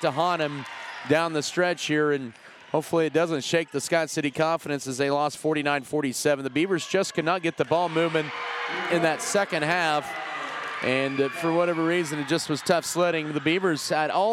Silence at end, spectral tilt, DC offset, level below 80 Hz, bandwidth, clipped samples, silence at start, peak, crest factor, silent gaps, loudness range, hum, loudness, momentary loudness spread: 0 s; -4 dB/octave; under 0.1%; -72 dBFS; 16 kHz; under 0.1%; 0 s; -8 dBFS; 18 dB; none; 1 LU; none; -25 LUFS; 7 LU